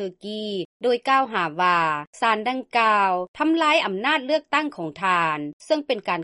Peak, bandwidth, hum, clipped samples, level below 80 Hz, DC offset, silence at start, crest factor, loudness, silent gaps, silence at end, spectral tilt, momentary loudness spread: -6 dBFS; 11.5 kHz; none; under 0.1%; -70 dBFS; under 0.1%; 0 s; 16 dB; -22 LUFS; 0.65-0.80 s, 2.07-2.13 s, 3.28-3.34 s, 5.53-5.60 s; 0 s; -4.5 dB/octave; 10 LU